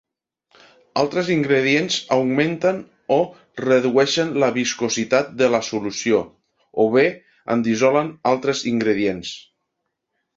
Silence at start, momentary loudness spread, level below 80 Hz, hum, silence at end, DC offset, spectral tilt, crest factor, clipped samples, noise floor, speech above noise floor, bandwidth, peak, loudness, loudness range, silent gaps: 0.95 s; 10 LU; -60 dBFS; none; 0.95 s; under 0.1%; -4.5 dB/octave; 18 dB; under 0.1%; -77 dBFS; 58 dB; 7.8 kHz; -2 dBFS; -20 LUFS; 1 LU; none